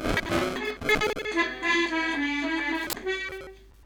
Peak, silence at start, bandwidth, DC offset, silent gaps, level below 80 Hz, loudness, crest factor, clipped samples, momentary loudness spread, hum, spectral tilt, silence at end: -10 dBFS; 0 s; 19 kHz; under 0.1%; none; -46 dBFS; -27 LUFS; 18 dB; under 0.1%; 7 LU; none; -3.5 dB/octave; 0.05 s